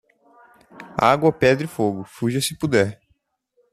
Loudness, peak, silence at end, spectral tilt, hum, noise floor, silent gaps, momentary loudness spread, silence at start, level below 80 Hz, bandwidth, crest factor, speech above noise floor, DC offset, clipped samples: -20 LUFS; -2 dBFS; 0.8 s; -5 dB/octave; none; -67 dBFS; none; 8 LU; 0.75 s; -54 dBFS; 14.5 kHz; 20 dB; 48 dB; under 0.1%; under 0.1%